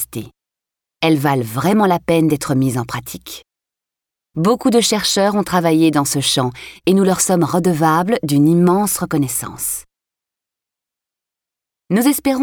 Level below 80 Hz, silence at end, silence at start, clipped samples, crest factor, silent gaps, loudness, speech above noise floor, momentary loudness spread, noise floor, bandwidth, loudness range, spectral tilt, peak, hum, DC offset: -50 dBFS; 0 s; 0 s; under 0.1%; 14 dB; none; -16 LUFS; 70 dB; 12 LU; -86 dBFS; over 20 kHz; 5 LU; -5 dB/octave; -4 dBFS; none; under 0.1%